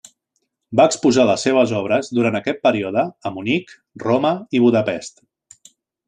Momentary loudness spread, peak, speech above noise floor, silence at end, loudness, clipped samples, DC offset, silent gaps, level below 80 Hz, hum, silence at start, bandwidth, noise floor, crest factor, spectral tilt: 10 LU; -2 dBFS; 55 dB; 1 s; -18 LUFS; under 0.1%; under 0.1%; none; -62 dBFS; none; 0.7 s; 10.5 kHz; -73 dBFS; 18 dB; -5 dB/octave